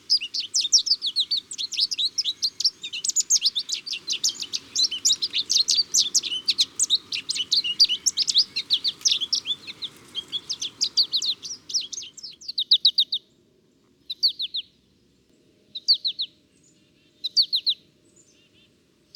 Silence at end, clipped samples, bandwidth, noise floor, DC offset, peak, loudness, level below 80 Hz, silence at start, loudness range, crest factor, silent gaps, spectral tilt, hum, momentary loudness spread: 1.4 s; under 0.1%; 19 kHz; -62 dBFS; under 0.1%; -6 dBFS; -22 LUFS; -74 dBFS; 0.1 s; 6 LU; 20 dB; none; 3 dB/octave; none; 12 LU